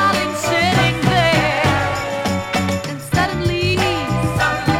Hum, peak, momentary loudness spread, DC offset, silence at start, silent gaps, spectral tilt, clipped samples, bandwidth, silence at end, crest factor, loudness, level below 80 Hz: none; -2 dBFS; 6 LU; under 0.1%; 0 s; none; -5 dB/octave; under 0.1%; 17 kHz; 0 s; 16 dB; -17 LUFS; -36 dBFS